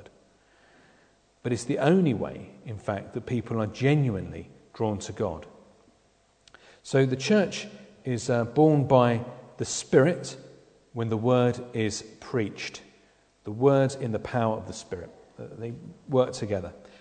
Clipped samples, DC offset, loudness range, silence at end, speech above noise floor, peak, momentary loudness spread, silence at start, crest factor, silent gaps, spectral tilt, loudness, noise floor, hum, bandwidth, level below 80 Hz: under 0.1%; under 0.1%; 5 LU; 0.2 s; 38 dB; -6 dBFS; 20 LU; 0 s; 22 dB; none; -6 dB/octave; -26 LUFS; -64 dBFS; none; 9.4 kHz; -60 dBFS